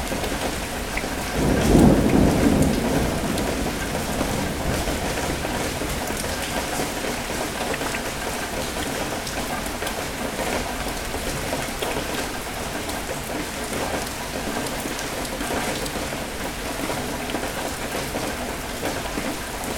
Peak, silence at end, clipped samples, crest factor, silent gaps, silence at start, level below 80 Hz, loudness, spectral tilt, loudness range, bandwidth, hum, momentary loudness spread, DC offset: -2 dBFS; 0 s; under 0.1%; 22 dB; none; 0 s; -34 dBFS; -25 LUFS; -4 dB/octave; 7 LU; 19 kHz; none; 9 LU; under 0.1%